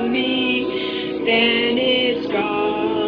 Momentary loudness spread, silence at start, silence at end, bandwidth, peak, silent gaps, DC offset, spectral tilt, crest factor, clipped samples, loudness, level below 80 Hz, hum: 7 LU; 0 s; 0 s; 5.4 kHz; -6 dBFS; none; under 0.1%; -6.5 dB/octave; 14 dB; under 0.1%; -19 LUFS; -52 dBFS; none